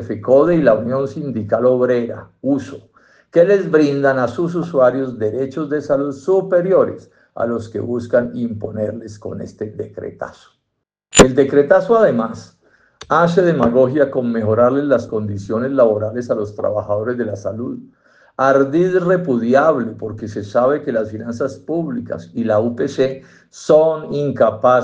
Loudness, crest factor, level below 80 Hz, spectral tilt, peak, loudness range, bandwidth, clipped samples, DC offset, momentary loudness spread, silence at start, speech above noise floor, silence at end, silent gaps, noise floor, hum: -16 LUFS; 16 dB; -46 dBFS; -5.5 dB/octave; 0 dBFS; 5 LU; 9.6 kHz; under 0.1%; under 0.1%; 14 LU; 0 s; 59 dB; 0 s; none; -75 dBFS; none